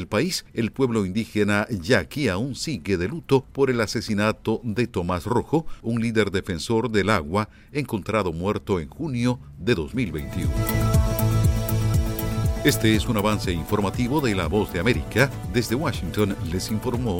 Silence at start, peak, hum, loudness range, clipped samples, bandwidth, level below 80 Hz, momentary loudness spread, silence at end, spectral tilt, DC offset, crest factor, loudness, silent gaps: 0 s; -4 dBFS; none; 3 LU; under 0.1%; 17 kHz; -34 dBFS; 6 LU; 0 s; -6 dB/octave; under 0.1%; 18 dB; -24 LUFS; none